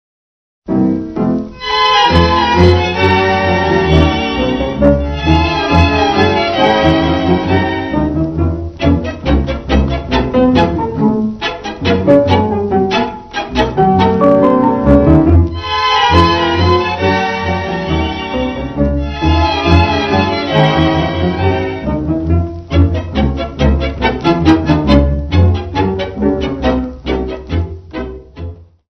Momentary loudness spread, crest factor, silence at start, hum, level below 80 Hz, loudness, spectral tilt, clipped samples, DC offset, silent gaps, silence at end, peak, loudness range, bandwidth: 9 LU; 12 dB; 0.65 s; none; -22 dBFS; -13 LUFS; -7 dB/octave; 0.3%; under 0.1%; none; 0.25 s; 0 dBFS; 4 LU; 6.4 kHz